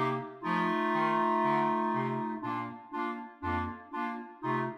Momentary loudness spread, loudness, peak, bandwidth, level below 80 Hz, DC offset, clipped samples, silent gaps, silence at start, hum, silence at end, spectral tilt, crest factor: 10 LU; -32 LUFS; -16 dBFS; 9.8 kHz; -68 dBFS; under 0.1%; under 0.1%; none; 0 s; none; 0 s; -7.5 dB/octave; 16 dB